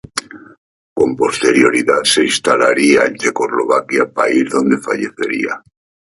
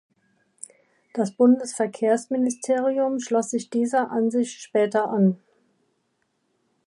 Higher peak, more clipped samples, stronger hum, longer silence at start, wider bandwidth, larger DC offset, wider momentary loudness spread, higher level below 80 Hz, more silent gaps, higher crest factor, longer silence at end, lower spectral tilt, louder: first, 0 dBFS vs -8 dBFS; neither; neither; second, 0.15 s vs 1.15 s; about the same, 11.5 kHz vs 11.5 kHz; neither; second, 9 LU vs 15 LU; first, -54 dBFS vs -78 dBFS; first, 0.58-0.96 s vs none; about the same, 14 dB vs 16 dB; second, 0.55 s vs 1.5 s; second, -3 dB/octave vs -6 dB/octave; first, -14 LUFS vs -23 LUFS